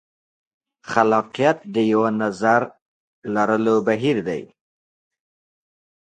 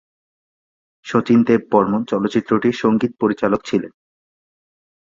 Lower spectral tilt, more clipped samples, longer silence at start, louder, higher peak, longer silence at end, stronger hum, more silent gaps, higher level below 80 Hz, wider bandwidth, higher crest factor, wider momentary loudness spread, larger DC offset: about the same, -6.5 dB/octave vs -7 dB/octave; neither; second, 0.85 s vs 1.05 s; about the same, -20 LUFS vs -18 LUFS; about the same, 0 dBFS vs 0 dBFS; first, 1.65 s vs 1.15 s; neither; first, 2.82-3.22 s vs none; second, -66 dBFS vs -56 dBFS; first, 9.4 kHz vs 7.6 kHz; about the same, 22 dB vs 18 dB; about the same, 10 LU vs 8 LU; neither